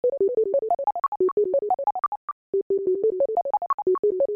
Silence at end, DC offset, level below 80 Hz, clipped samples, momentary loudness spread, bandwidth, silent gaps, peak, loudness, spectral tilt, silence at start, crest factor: 0 s; under 0.1%; -68 dBFS; under 0.1%; 6 LU; 2.5 kHz; 1.08-1.12 s, 1.32-1.37 s, 2.08-2.53 s, 2.62-2.70 s, 3.74-3.78 s, 3.99-4.03 s; -14 dBFS; -24 LUFS; -10.5 dB/octave; 0.05 s; 8 dB